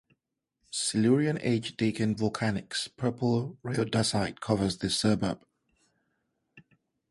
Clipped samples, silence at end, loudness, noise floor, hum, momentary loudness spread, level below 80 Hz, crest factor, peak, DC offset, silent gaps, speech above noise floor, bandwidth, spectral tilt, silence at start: under 0.1%; 0.5 s; -29 LUFS; -82 dBFS; none; 7 LU; -58 dBFS; 20 dB; -10 dBFS; under 0.1%; none; 54 dB; 11.5 kHz; -5 dB/octave; 0.7 s